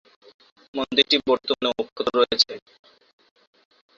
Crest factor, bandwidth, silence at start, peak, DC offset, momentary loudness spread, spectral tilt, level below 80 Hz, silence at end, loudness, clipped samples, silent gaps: 24 dB; 7.6 kHz; 0.75 s; -2 dBFS; under 0.1%; 12 LU; -2.5 dB/octave; -62 dBFS; 1.4 s; -21 LUFS; under 0.1%; 1.92-1.96 s